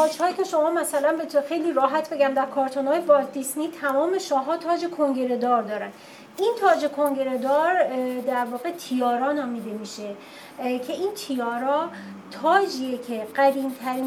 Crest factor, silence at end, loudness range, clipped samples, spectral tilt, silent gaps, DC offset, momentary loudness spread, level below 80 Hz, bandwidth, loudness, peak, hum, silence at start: 18 dB; 0 s; 5 LU; under 0.1%; -3.5 dB/octave; none; under 0.1%; 11 LU; -82 dBFS; 18.5 kHz; -24 LUFS; -6 dBFS; none; 0 s